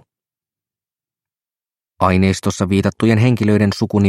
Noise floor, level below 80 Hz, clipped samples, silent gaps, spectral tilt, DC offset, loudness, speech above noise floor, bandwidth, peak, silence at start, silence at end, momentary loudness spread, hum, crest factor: under -90 dBFS; -48 dBFS; under 0.1%; none; -6.5 dB/octave; under 0.1%; -16 LUFS; over 76 dB; 13.5 kHz; 0 dBFS; 2 s; 0 s; 3 LU; none; 16 dB